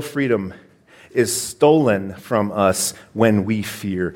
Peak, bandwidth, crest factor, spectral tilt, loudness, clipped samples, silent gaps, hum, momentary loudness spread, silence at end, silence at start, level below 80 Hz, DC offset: -2 dBFS; 17 kHz; 18 dB; -5 dB/octave; -19 LUFS; under 0.1%; none; none; 9 LU; 0 s; 0 s; -56 dBFS; under 0.1%